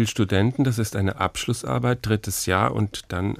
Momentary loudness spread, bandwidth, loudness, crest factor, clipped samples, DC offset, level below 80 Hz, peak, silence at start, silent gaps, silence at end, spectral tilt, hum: 6 LU; 16 kHz; -23 LUFS; 18 dB; under 0.1%; under 0.1%; -48 dBFS; -4 dBFS; 0 s; none; 0 s; -5 dB/octave; none